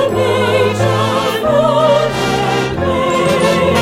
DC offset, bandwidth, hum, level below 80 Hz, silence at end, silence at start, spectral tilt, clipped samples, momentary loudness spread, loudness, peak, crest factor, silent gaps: under 0.1%; 16.5 kHz; none; -38 dBFS; 0 s; 0 s; -5.5 dB/octave; under 0.1%; 4 LU; -13 LUFS; -2 dBFS; 12 dB; none